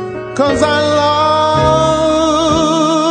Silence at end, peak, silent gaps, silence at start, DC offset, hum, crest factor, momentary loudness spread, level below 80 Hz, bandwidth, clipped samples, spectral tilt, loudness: 0 s; 0 dBFS; none; 0 s; under 0.1%; none; 12 dB; 2 LU; -34 dBFS; 9.4 kHz; under 0.1%; -5 dB/octave; -12 LUFS